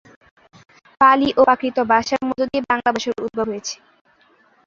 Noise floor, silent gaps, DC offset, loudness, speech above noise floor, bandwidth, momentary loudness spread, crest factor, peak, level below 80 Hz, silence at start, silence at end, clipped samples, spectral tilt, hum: -56 dBFS; none; under 0.1%; -18 LUFS; 38 dB; 7.4 kHz; 11 LU; 18 dB; -2 dBFS; -56 dBFS; 1 s; 0.9 s; under 0.1%; -3.5 dB/octave; none